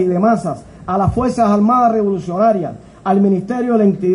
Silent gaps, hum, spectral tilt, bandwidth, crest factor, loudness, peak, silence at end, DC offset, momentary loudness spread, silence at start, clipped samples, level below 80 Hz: none; none; -8.5 dB/octave; 10.5 kHz; 12 dB; -15 LUFS; -2 dBFS; 0 s; under 0.1%; 10 LU; 0 s; under 0.1%; -40 dBFS